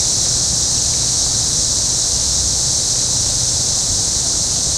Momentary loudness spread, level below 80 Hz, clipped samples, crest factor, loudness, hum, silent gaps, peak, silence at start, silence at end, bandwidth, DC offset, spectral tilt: 1 LU; -32 dBFS; under 0.1%; 14 dB; -13 LUFS; none; none; -2 dBFS; 0 s; 0 s; 16 kHz; under 0.1%; -1 dB/octave